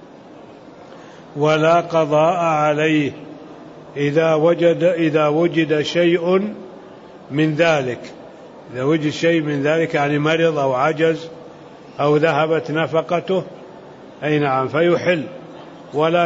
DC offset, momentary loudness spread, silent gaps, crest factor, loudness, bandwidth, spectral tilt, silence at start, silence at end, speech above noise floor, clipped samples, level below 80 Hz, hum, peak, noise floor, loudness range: under 0.1%; 20 LU; none; 16 dB; -18 LUFS; 7.8 kHz; -6.5 dB/octave; 0 s; 0 s; 23 dB; under 0.1%; -62 dBFS; none; -4 dBFS; -40 dBFS; 3 LU